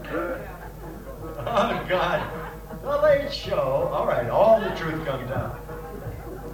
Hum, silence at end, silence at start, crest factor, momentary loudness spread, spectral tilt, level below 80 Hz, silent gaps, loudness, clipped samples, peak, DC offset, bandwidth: none; 0 s; 0 s; 18 dB; 17 LU; -6 dB/octave; -42 dBFS; none; -24 LUFS; under 0.1%; -8 dBFS; under 0.1%; 19 kHz